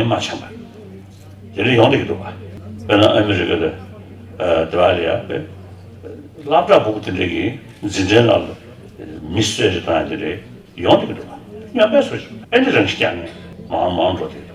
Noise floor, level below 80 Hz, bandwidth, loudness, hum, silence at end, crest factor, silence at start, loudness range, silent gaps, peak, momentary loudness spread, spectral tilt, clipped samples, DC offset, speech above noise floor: -38 dBFS; -48 dBFS; 13 kHz; -17 LUFS; none; 0 s; 18 dB; 0 s; 2 LU; none; 0 dBFS; 23 LU; -5.5 dB/octave; under 0.1%; under 0.1%; 21 dB